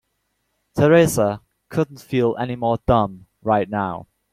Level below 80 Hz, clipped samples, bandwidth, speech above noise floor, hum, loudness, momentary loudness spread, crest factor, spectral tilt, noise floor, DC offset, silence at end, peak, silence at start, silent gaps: -44 dBFS; under 0.1%; 16 kHz; 53 dB; none; -20 LUFS; 14 LU; 18 dB; -6.5 dB/octave; -72 dBFS; under 0.1%; 0.3 s; -2 dBFS; 0.75 s; none